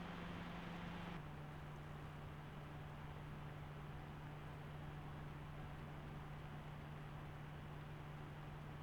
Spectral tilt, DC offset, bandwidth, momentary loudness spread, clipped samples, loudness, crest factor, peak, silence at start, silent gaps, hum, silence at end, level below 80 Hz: -7 dB/octave; under 0.1%; over 20 kHz; 3 LU; under 0.1%; -53 LUFS; 14 dB; -38 dBFS; 0 s; none; none; 0 s; -62 dBFS